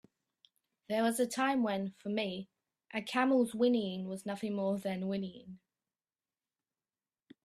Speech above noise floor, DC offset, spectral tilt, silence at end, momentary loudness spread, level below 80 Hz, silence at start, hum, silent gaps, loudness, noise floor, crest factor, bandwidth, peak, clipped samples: over 57 dB; under 0.1%; -5 dB/octave; 1.9 s; 13 LU; -78 dBFS; 0.9 s; none; none; -34 LUFS; under -90 dBFS; 20 dB; 14.5 kHz; -16 dBFS; under 0.1%